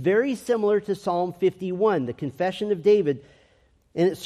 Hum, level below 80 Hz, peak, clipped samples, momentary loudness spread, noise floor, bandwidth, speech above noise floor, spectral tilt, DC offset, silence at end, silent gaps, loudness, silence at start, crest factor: none; -64 dBFS; -10 dBFS; under 0.1%; 8 LU; -61 dBFS; 13 kHz; 38 dB; -6.5 dB/octave; under 0.1%; 0 s; none; -24 LUFS; 0 s; 14 dB